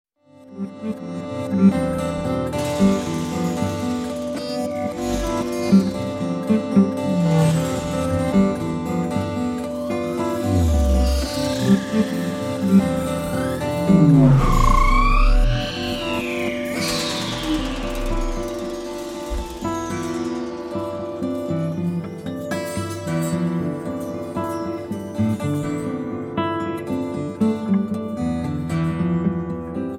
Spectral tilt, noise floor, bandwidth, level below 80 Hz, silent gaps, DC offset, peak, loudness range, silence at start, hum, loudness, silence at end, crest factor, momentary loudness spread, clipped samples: -6.5 dB/octave; -46 dBFS; 16 kHz; -28 dBFS; none; under 0.1%; -4 dBFS; 8 LU; 0.4 s; none; -22 LUFS; 0 s; 18 dB; 10 LU; under 0.1%